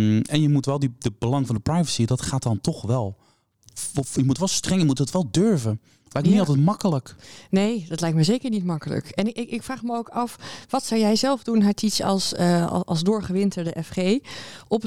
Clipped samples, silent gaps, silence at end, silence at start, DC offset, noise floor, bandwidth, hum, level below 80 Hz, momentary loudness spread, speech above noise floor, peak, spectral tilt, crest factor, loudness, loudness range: under 0.1%; none; 0 s; 0 s; 0.3%; -55 dBFS; 15.5 kHz; none; -52 dBFS; 9 LU; 32 dB; -8 dBFS; -5.5 dB/octave; 14 dB; -23 LUFS; 3 LU